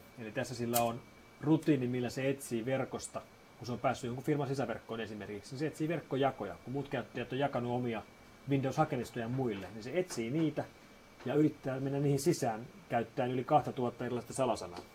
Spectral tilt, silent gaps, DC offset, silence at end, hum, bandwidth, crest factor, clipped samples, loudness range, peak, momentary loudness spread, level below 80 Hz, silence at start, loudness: -6 dB/octave; none; under 0.1%; 0 s; none; 16 kHz; 20 dB; under 0.1%; 3 LU; -16 dBFS; 11 LU; -66 dBFS; 0 s; -35 LUFS